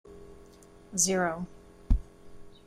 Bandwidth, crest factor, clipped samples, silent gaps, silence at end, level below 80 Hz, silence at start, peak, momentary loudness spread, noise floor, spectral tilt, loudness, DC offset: 14.5 kHz; 22 dB; under 0.1%; none; 0.2 s; -36 dBFS; 0.05 s; -12 dBFS; 22 LU; -53 dBFS; -3.5 dB/octave; -30 LUFS; under 0.1%